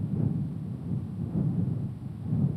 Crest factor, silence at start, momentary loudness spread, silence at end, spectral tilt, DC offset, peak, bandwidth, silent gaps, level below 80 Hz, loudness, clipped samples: 14 dB; 0 s; 7 LU; 0 s; -11 dB/octave; under 0.1%; -14 dBFS; 4.5 kHz; none; -52 dBFS; -32 LUFS; under 0.1%